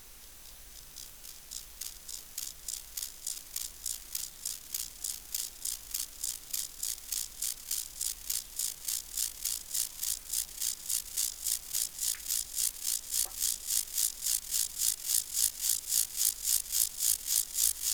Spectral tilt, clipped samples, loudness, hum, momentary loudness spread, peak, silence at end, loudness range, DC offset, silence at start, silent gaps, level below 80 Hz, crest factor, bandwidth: 2.5 dB/octave; under 0.1%; -32 LUFS; none; 13 LU; -10 dBFS; 0 s; 10 LU; 0.1%; 0 s; none; -58 dBFS; 26 dB; over 20 kHz